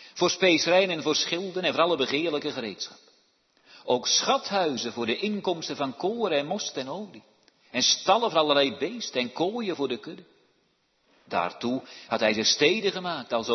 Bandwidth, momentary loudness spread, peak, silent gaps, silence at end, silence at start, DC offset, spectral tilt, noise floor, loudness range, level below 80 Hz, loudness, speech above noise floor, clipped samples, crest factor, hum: 6.4 kHz; 12 LU; -6 dBFS; none; 0 s; 0 s; under 0.1%; -2.5 dB/octave; -70 dBFS; 4 LU; -74 dBFS; -25 LUFS; 43 dB; under 0.1%; 20 dB; none